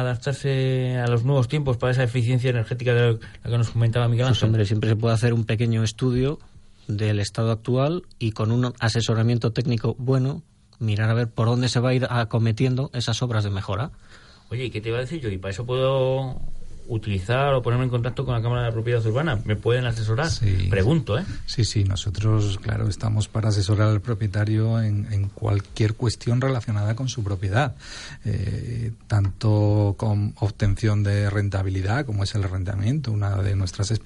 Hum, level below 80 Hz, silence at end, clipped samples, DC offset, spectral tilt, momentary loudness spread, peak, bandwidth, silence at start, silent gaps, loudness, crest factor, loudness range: none; -40 dBFS; 0 s; under 0.1%; under 0.1%; -6.5 dB/octave; 7 LU; -8 dBFS; 11 kHz; 0 s; none; -23 LUFS; 14 dB; 3 LU